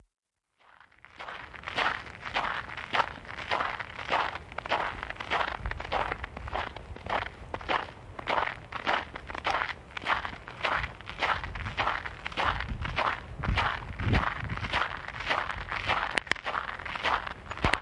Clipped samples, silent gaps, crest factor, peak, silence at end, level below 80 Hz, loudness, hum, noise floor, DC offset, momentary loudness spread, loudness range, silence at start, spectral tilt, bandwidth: under 0.1%; none; 26 dB; -6 dBFS; 0 s; -44 dBFS; -32 LUFS; none; -69 dBFS; under 0.1%; 8 LU; 3 LU; 1.1 s; -4.5 dB/octave; 11.5 kHz